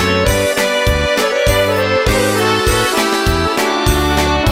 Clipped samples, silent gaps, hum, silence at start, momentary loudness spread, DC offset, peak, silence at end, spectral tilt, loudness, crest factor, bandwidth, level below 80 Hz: under 0.1%; none; none; 0 s; 1 LU; under 0.1%; 0 dBFS; 0 s; -4 dB/octave; -13 LUFS; 12 dB; 16 kHz; -24 dBFS